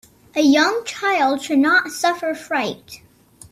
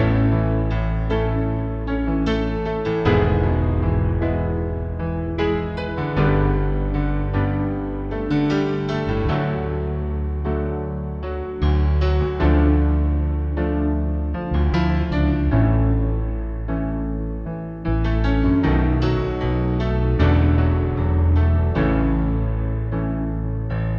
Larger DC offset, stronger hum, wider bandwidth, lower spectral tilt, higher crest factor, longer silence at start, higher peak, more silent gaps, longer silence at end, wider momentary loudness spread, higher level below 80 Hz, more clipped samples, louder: neither; neither; first, 14.5 kHz vs 6 kHz; second, -2.5 dB/octave vs -9.5 dB/octave; about the same, 16 dB vs 16 dB; first, 0.35 s vs 0 s; about the same, -4 dBFS vs -4 dBFS; neither; first, 0.55 s vs 0 s; first, 11 LU vs 8 LU; second, -62 dBFS vs -24 dBFS; neither; first, -18 LUFS vs -21 LUFS